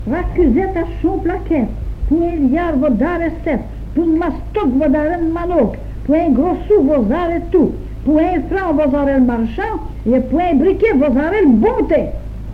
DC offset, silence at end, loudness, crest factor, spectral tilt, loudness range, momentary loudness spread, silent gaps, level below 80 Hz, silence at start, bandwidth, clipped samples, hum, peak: under 0.1%; 0 s; -15 LUFS; 12 dB; -9.5 dB/octave; 3 LU; 8 LU; none; -26 dBFS; 0 s; 5.4 kHz; under 0.1%; none; -2 dBFS